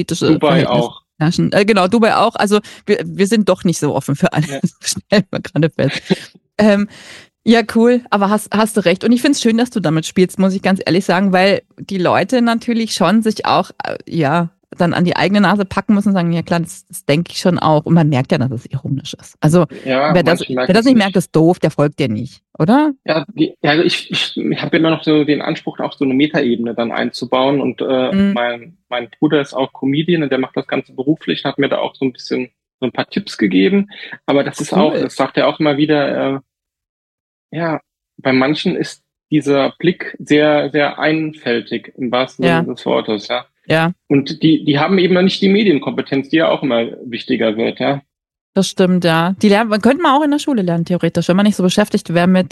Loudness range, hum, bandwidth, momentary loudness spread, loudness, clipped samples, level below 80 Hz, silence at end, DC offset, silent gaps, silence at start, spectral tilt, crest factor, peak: 4 LU; none; 12.5 kHz; 9 LU; -15 LUFS; under 0.1%; -52 dBFS; 0.05 s; under 0.1%; 32.74-32.79 s, 36.89-37.49 s, 48.41-48.53 s; 0 s; -6 dB/octave; 14 dB; 0 dBFS